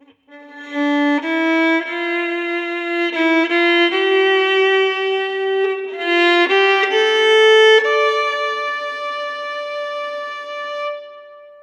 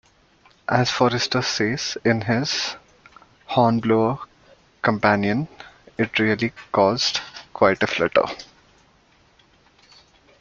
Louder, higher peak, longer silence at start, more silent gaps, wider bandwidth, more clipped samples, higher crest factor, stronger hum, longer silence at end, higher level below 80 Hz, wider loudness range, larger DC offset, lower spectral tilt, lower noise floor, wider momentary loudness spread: first, -16 LUFS vs -21 LUFS; about the same, -2 dBFS vs -2 dBFS; second, 0.3 s vs 0.7 s; neither; first, 9.8 kHz vs 7.6 kHz; neither; second, 14 dB vs 22 dB; neither; second, 0.1 s vs 1.95 s; second, -82 dBFS vs -56 dBFS; first, 6 LU vs 2 LU; neither; second, -1 dB/octave vs -4.5 dB/octave; second, -43 dBFS vs -58 dBFS; about the same, 13 LU vs 13 LU